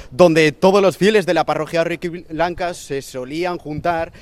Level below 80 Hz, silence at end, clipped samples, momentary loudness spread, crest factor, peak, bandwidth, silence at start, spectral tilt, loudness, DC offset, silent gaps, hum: -46 dBFS; 0 s; under 0.1%; 13 LU; 16 dB; 0 dBFS; 14.5 kHz; 0 s; -5.5 dB/octave; -18 LUFS; under 0.1%; none; none